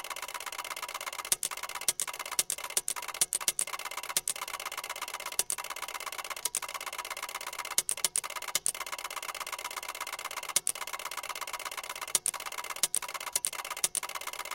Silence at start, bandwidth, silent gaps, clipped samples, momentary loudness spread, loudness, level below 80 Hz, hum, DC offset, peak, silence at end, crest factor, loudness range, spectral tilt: 0 s; 17 kHz; none; under 0.1%; 8 LU; -33 LUFS; -70 dBFS; none; under 0.1%; -6 dBFS; 0 s; 30 dB; 3 LU; 2 dB/octave